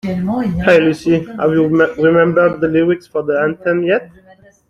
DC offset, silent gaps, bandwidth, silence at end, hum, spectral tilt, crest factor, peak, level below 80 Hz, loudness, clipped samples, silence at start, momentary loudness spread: under 0.1%; none; 11 kHz; 0.6 s; none; -7.5 dB/octave; 12 dB; -2 dBFS; -42 dBFS; -14 LUFS; under 0.1%; 0.05 s; 7 LU